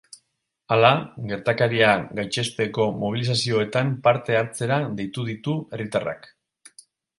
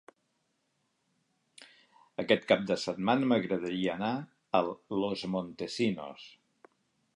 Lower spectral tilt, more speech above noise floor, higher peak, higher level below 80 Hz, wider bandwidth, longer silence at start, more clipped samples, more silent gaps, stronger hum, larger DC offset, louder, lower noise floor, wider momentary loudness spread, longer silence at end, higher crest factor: about the same, -5 dB/octave vs -5.5 dB/octave; first, 52 dB vs 47 dB; first, 0 dBFS vs -10 dBFS; first, -60 dBFS vs -72 dBFS; about the same, 11.5 kHz vs 11.5 kHz; second, 0.7 s vs 1.6 s; neither; neither; neither; neither; first, -23 LUFS vs -31 LUFS; about the same, -75 dBFS vs -78 dBFS; about the same, 11 LU vs 13 LU; first, 1 s vs 0.85 s; about the same, 22 dB vs 22 dB